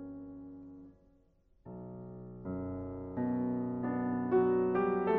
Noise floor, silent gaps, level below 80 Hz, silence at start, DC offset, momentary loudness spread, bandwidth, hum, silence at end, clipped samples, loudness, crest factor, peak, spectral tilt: -68 dBFS; none; -62 dBFS; 0 s; under 0.1%; 20 LU; 3.8 kHz; none; 0 s; under 0.1%; -34 LUFS; 16 dB; -18 dBFS; -8.5 dB/octave